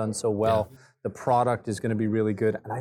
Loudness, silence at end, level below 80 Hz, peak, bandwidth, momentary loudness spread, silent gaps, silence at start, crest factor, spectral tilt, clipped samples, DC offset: -26 LUFS; 0 s; -60 dBFS; -10 dBFS; 18 kHz; 11 LU; none; 0 s; 16 dB; -6.5 dB/octave; under 0.1%; under 0.1%